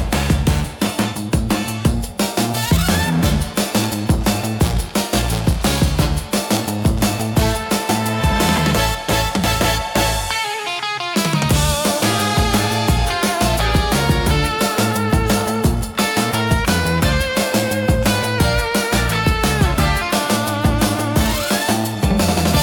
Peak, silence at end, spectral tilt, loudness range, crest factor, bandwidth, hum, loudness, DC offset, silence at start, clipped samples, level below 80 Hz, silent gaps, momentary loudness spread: -2 dBFS; 0 s; -4.5 dB/octave; 2 LU; 14 dB; 18 kHz; none; -17 LUFS; under 0.1%; 0 s; under 0.1%; -26 dBFS; none; 3 LU